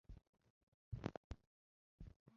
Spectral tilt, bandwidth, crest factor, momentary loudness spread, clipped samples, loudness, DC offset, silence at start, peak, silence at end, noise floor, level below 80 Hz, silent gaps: -7 dB/octave; 7 kHz; 30 dB; 15 LU; under 0.1%; -55 LUFS; under 0.1%; 0.1 s; -26 dBFS; 0 s; under -90 dBFS; -62 dBFS; 0.29-0.33 s, 0.50-0.92 s, 1.17-1.30 s, 1.47-1.98 s, 2.16-2.26 s